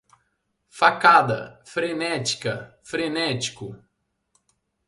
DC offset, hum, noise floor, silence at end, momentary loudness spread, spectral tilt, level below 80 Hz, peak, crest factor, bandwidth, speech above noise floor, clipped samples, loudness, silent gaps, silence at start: under 0.1%; none; -73 dBFS; 1.1 s; 16 LU; -3.5 dB/octave; -64 dBFS; 0 dBFS; 24 dB; 11.5 kHz; 50 dB; under 0.1%; -22 LUFS; none; 0.75 s